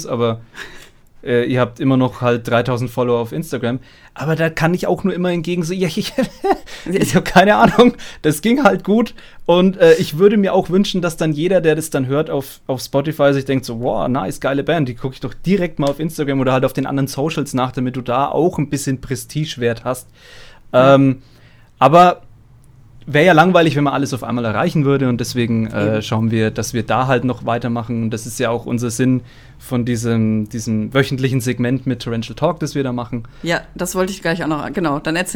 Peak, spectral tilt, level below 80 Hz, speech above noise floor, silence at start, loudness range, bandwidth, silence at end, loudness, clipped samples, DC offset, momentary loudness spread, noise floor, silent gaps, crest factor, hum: 0 dBFS; -6 dB/octave; -42 dBFS; 28 dB; 0 s; 6 LU; 20 kHz; 0 s; -17 LUFS; under 0.1%; under 0.1%; 11 LU; -44 dBFS; none; 16 dB; none